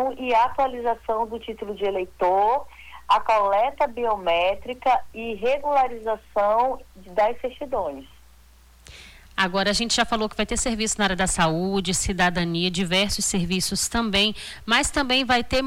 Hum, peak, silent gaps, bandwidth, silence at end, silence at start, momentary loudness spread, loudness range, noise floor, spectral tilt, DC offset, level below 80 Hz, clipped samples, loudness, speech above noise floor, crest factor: none; -8 dBFS; none; 19 kHz; 0 s; 0 s; 8 LU; 4 LU; -52 dBFS; -3 dB/octave; under 0.1%; -42 dBFS; under 0.1%; -23 LUFS; 29 dB; 14 dB